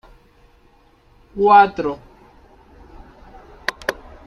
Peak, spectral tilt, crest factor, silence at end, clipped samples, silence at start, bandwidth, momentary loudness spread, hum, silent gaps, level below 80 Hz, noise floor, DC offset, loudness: -2 dBFS; -5 dB/octave; 20 dB; 0.35 s; under 0.1%; 1.35 s; 13 kHz; 20 LU; none; none; -48 dBFS; -53 dBFS; under 0.1%; -17 LUFS